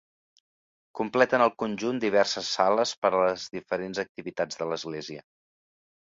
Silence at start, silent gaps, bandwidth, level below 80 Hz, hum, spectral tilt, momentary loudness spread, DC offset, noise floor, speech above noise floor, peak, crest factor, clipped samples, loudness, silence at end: 0.95 s; 2.97-3.02 s, 4.09-4.15 s; 7.8 kHz; -68 dBFS; none; -3.5 dB/octave; 12 LU; under 0.1%; under -90 dBFS; over 63 dB; -6 dBFS; 22 dB; under 0.1%; -27 LUFS; 0.85 s